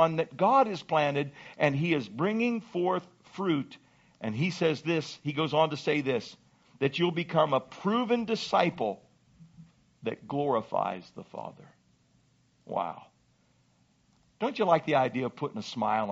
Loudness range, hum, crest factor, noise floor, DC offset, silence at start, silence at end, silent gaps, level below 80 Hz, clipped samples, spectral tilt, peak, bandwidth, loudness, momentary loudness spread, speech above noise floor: 7 LU; none; 20 dB; -67 dBFS; under 0.1%; 0 s; 0 s; none; -72 dBFS; under 0.1%; -4.5 dB/octave; -10 dBFS; 8 kHz; -29 LUFS; 13 LU; 39 dB